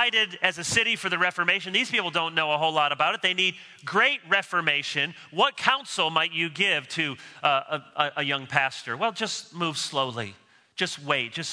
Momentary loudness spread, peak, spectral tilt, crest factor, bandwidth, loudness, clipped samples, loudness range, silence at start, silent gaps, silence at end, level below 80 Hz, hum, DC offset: 7 LU; -4 dBFS; -2.5 dB/octave; 22 dB; 11 kHz; -25 LUFS; under 0.1%; 4 LU; 0 s; none; 0 s; -70 dBFS; none; under 0.1%